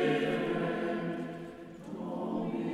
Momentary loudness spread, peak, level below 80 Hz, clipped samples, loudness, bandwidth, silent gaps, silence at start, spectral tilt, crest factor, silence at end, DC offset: 14 LU; -18 dBFS; -66 dBFS; under 0.1%; -35 LUFS; 13 kHz; none; 0 s; -7 dB/octave; 16 dB; 0 s; under 0.1%